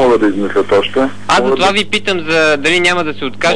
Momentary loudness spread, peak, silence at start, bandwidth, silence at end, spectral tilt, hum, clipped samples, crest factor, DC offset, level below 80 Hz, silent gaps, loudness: 5 LU; -2 dBFS; 0 s; 11 kHz; 0 s; -4 dB/octave; 50 Hz at -35 dBFS; under 0.1%; 10 dB; 6%; -44 dBFS; none; -12 LUFS